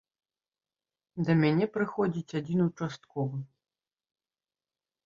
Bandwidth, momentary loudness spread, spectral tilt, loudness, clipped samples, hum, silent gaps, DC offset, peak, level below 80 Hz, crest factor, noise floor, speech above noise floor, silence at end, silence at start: 7.4 kHz; 14 LU; -8 dB/octave; -30 LUFS; under 0.1%; none; none; under 0.1%; -12 dBFS; -70 dBFS; 20 dB; under -90 dBFS; over 61 dB; 1.6 s; 1.15 s